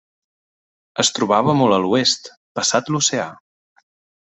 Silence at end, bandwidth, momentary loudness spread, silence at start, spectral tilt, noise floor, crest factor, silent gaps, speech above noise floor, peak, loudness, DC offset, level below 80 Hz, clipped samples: 1 s; 8.4 kHz; 12 LU; 0.95 s; -3.5 dB/octave; under -90 dBFS; 20 dB; 2.37-2.55 s; over 72 dB; -2 dBFS; -17 LUFS; under 0.1%; -62 dBFS; under 0.1%